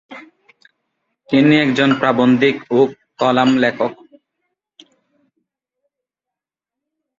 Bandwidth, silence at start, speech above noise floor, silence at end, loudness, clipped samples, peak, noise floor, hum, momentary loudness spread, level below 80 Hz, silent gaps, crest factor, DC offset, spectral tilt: 7.4 kHz; 0.1 s; 72 dB; 3.25 s; -15 LUFS; under 0.1%; 0 dBFS; -86 dBFS; none; 7 LU; -60 dBFS; none; 18 dB; under 0.1%; -6.5 dB/octave